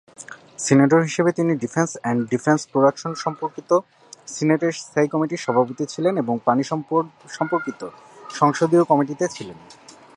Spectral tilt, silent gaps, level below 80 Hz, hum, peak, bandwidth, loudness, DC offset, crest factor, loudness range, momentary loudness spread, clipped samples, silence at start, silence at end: -6 dB/octave; none; -68 dBFS; none; -2 dBFS; 11 kHz; -21 LUFS; under 0.1%; 20 dB; 3 LU; 17 LU; under 0.1%; 0.2 s; 0.45 s